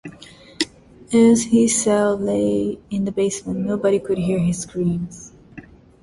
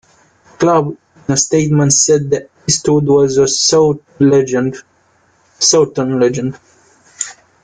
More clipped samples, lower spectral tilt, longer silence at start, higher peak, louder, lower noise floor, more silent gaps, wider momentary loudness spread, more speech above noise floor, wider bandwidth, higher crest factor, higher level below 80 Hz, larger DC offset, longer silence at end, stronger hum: neither; about the same, -5 dB/octave vs -4 dB/octave; second, 0.05 s vs 0.6 s; second, -4 dBFS vs 0 dBFS; second, -19 LUFS vs -13 LUFS; second, -44 dBFS vs -54 dBFS; neither; second, 11 LU vs 14 LU; second, 25 dB vs 42 dB; first, 11.5 kHz vs 10 kHz; about the same, 16 dB vs 14 dB; about the same, -50 dBFS vs -50 dBFS; neither; about the same, 0.4 s vs 0.3 s; neither